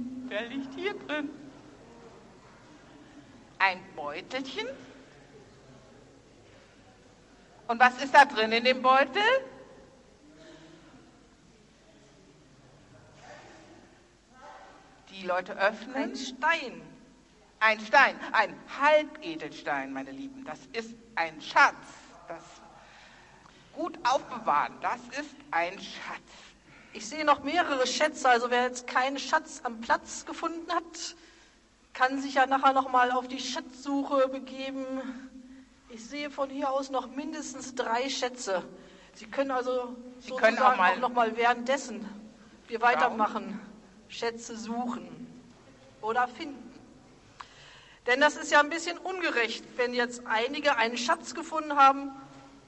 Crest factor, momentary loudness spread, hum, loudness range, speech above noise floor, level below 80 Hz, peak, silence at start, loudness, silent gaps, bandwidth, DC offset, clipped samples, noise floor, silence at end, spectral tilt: 24 dB; 21 LU; none; 9 LU; 33 dB; -68 dBFS; -6 dBFS; 0 s; -28 LUFS; none; 11 kHz; under 0.1%; under 0.1%; -61 dBFS; 0.2 s; -2.5 dB/octave